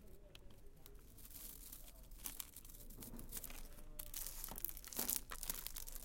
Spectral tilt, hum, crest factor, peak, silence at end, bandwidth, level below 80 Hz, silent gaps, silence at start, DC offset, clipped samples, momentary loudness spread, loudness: -1.5 dB/octave; none; 34 dB; -16 dBFS; 0 s; 17 kHz; -56 dBFS; none; 0 s; under 0.1%; under 0.1%; 20 LU; -47 LUFS